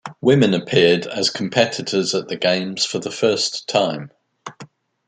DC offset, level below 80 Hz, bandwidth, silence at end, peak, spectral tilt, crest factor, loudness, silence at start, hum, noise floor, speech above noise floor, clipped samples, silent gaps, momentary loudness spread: under 0.1%; -60 dBFS; 9.6 kHz; 0.4 s; -2 dBFS; -4 dB/octave; 18 dB; -18 LUFS; 0.05 s; none; -44 dBFS; 25 dB; under 0.1%; none; 14 LU